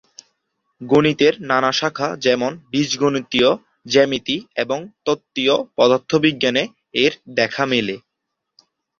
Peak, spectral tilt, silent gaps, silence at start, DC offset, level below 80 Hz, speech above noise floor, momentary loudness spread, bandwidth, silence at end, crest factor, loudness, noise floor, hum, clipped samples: -2 dBFS; -4.5 dB/octave; none; 0.8 s; under 0.1%; -58 dBFS; 60 dB; 7 LU; 7.4 kHz; 1 s; 18 dB; -18 LUFS; -79 dBFS; none; under 0.1%